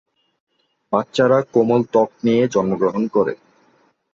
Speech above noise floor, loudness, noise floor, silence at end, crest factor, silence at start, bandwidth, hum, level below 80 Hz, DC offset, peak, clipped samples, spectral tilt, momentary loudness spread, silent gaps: 42 dB; -18 LUFS; -59 dBFS; 0.8 s; 16 dB; 0.9 s; 7.8 kHz; none; -60 dBFS; under 0.1%; -2 dBFS; under 0.1%; -7 dB/octave; 7 LU; none